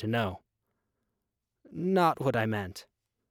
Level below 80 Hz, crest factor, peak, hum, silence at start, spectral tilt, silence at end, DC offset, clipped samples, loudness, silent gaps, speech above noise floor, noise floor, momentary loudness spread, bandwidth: -66 dBFS; 18 dB; -14 dBFS; none; 0 s; -6.5 dB/octave; 0.5 s; under 0.1%; under 0.1%; -29 LUFS; none; 56 dB; -85 dBFS; 21 LU; 18 kHz